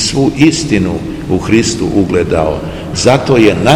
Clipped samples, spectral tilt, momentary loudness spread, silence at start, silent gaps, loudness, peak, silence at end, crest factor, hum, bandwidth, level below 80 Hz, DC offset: 1%; -5 dB/octave; 8 LU; 0 s; none; -11 LUFS; 0 dBFS; 0 s; 10 dB; none; 14 kHz; -30 dBFS; under 0.1%